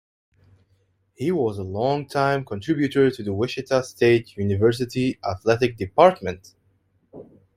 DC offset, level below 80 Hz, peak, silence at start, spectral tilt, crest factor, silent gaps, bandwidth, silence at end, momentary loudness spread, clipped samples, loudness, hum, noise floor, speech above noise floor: under 0.1%; -56 dBFS; -2 dBFS; 1.2 s; -6.5 dB/octave; 22 dB; none; 15 kHz; 0.35 s; 9 LU; under 0.1%; -22 LUFS; none; -65 dBFS; 44 dB